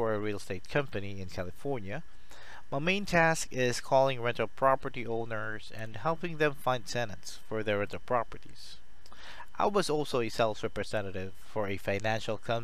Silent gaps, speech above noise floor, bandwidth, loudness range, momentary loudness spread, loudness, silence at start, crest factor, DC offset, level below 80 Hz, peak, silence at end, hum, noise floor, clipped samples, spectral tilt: none; 21 dB; 14.5 kHz; 5 LU; 16 LU; -32 LUFS; 0 s; 22 dB; 2%; -56 dBFS; -12 dBFS; 0 s; none; -53 dBFS; under 0.1%; -5 dB/octave